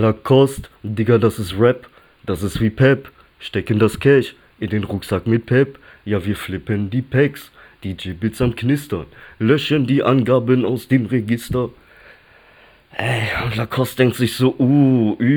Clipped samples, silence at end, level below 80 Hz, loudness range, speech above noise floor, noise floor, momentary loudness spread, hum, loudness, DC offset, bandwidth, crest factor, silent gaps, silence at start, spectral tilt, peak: under 0.1%; 0 s; -44 dBFS; 4 LU; 32 dB; -49 dBFS; 13 LU; none; -18 LUFS; under 0.1%; over 20 kHz; 16 dB; none; 0 s; -7 dB/octave; -2 dBFS